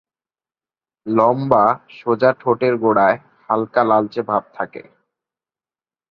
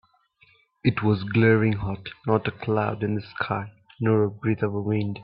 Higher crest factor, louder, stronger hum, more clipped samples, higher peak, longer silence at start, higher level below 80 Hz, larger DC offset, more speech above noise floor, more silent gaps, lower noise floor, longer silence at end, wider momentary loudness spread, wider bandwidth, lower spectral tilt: about the same, 18 dB vs 20 dB; first, -17 LUFS vs -25 LUFS; neither; neither; first, 0 dBFS vs -6 dBFS; first, 1.05 s vs 0.85 s; second, -60 dBFS vs -54 dBFS; neither; first, over 73 dB vs 37 dB; neither; first, under -90 dBFS vs -61 dBFS; first, 1.3 s vs 0 s; about the same, 11 LU vs 9 LU; first, 5.8 kHz vs 5.2 kHz; second, -9 dB/octave vs -12 dB/octave